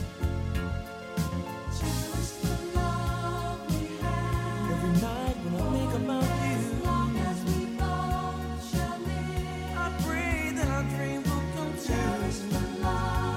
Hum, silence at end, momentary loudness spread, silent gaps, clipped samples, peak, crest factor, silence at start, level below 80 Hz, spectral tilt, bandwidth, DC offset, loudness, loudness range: none; 0 s; 5 LU; none; under 0.1%; -14 dBFS; 16 dB; 0 s; -38 dBFS; -6 dB/octave; 16 kHz; under 0.1%; -30 LUFS; 3 LU